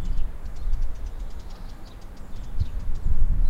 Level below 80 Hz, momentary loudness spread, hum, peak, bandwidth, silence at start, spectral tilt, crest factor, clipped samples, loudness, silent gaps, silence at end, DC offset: -24 dBFS; 13 LU; none; -8 dBFS; 4.5 kHz; 0 s; -7 dB/octave; 14 dB; under 0.1%; -35 LUFS; none; 0 s; under 0.1%